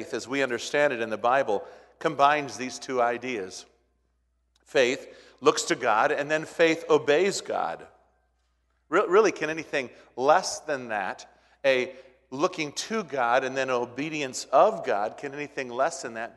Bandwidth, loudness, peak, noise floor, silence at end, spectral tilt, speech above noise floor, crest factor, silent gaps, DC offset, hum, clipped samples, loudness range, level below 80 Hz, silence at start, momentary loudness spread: 12 kHz; -26 LUFS; -6 dBFS; -71 dBFS; 0.05 s; -3.5 dB/octave; 45 dB; 20 dB; none; under 0.1%; none; under 0.1%; 3 LU; -72 dBFS; 0 s; 12 LU